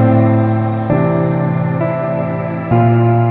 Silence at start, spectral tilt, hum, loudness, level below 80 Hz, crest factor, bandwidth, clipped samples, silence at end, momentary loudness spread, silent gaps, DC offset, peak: 0 s; -12.5 dB/octave; none; -14 LUFS; -44 dBFS; 12 dB; 4 kHz; under 0.1%; 0 s; 7 LU; none; under 0.1%; 0 dBFS